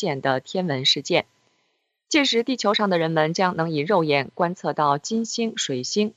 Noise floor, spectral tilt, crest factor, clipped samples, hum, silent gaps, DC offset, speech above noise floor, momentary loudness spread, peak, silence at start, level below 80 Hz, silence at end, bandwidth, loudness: -72 dBFS; -4 dB/octave; 18 dB; under 0.1%; none; none; under 0.1%; 50 dB; 6 LU; -4 dBFS; 0 s; -74 dBFS; 0.05 s; 9.2 kHz; -22 LUFS